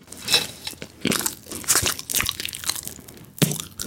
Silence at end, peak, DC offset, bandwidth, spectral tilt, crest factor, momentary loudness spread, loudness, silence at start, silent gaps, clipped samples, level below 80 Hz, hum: 0 s; -2 dBFS; under 0.1%; 17 kHz; -2 dB/octave; 24 dB; 15 LU; -23 LUFS; 0 s; none; under 0.1%; -50 dBFS; none